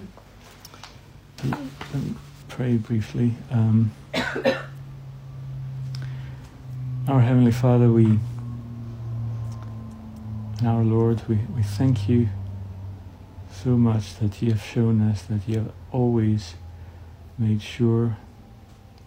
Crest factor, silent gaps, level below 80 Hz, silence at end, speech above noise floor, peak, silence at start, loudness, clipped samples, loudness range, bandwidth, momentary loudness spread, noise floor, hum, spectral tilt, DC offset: 18 dB; none; -48 dBFS; 0 s; 26 dB; -6 dBFS; 0 s; -24 LUFS; under 0.1%; 5 LU; 9 kHz; 21 LU; -47 dBFS; none; -8 dB/octave; under 0.1%